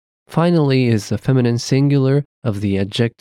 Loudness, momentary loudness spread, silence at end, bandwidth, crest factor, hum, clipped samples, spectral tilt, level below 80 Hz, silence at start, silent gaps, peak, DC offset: -17 LUFS; 6 LU; 0.1 s; 12.5 kHz; 12 dB; none; under 0.1%; -7 dB/octave; -54 dBFS; 0.3 s; 2.25-2.42 s; -4 dBFS; under 0.1%